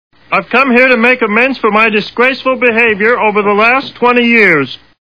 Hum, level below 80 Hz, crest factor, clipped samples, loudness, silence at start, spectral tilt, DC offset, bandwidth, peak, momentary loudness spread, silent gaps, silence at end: none; -50 dBFS; 10 dB; 0.5%; -9 LUFS; 0.3 s; -6.5 dB/octave; 0.3%; 5.4 kHz; 0 dBFS; 5 LU; none; 0.25 s